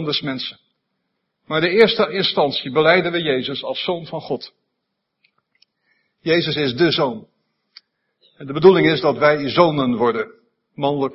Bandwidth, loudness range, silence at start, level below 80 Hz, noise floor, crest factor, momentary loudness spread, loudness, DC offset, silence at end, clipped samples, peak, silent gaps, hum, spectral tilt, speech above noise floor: 5.8 kHz; 7 LU; 0 s; -60 dBFS; -76 dBFS; 20 dB; 14 LU; -18 LUFS; under 0.1%; 0 s; under 0.1%; 0 dBFS; none; none; -8 dB/octave; 58 dB